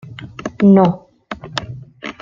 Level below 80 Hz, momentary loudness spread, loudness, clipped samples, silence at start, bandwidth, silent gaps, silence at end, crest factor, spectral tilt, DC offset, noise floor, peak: -50 dBFS; 22 LU; -15 LUFS; under 0.1%; 0.05 s; 7.6 kHz; none; 0.1 s; 16 dB; -7.5 dB/octave; under 0.1%; -33 dBFS; -2 dBFS